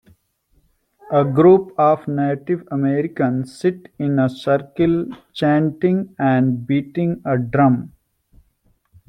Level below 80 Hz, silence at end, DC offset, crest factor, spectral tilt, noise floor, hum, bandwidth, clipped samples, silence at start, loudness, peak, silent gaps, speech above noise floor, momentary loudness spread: -56 dBFS; 1.2 s; under 0.1%; 16 dB; -9 dB/octave; -62 dBFS; none; 10 kHz; under 0.1%; 1.1 s; -18 LUFS; -2 dBFS; none; 44 dB; 9 LU